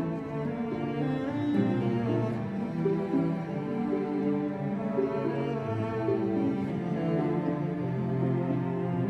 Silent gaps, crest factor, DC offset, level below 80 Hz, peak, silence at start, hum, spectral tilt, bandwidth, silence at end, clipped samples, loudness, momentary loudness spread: none; 14 dB; under 0.1%; -60 dBFS; -14 dBFS; 0 s; none; -9.5 dB/octave; 8.2 kHz; 0 s; under 0.1%; -30 LUFS; 4 LU